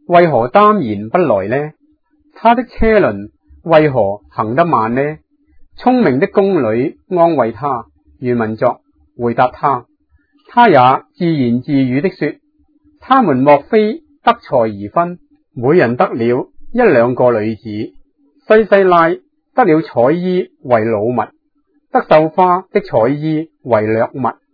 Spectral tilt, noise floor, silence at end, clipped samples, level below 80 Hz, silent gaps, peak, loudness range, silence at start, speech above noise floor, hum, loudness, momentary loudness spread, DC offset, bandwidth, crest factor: -10 dB/octave; -60 dBFS; 0.2 s; 0.1%; -40 dBFS; none; 0 dBFS; 2 LU; 0.1 s; 48 dB; none; -13 LUFS; 11 LU; under 0.1%; 5.4 kHz; 14 dB